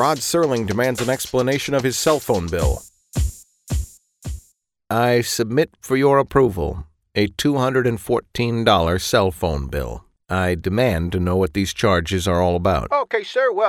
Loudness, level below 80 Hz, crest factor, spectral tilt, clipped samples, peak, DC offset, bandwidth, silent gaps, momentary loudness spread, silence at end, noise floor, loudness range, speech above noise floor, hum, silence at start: -20 LUFS; -34 dBFS; 18 dB; -5 dB/octave; under 0.1%; -2 dBFS; under 0.1%; 18.5 kHz; none; 10 LU; 0 s; -59 dBFS; 4 LU; 41 dB; none; 0 s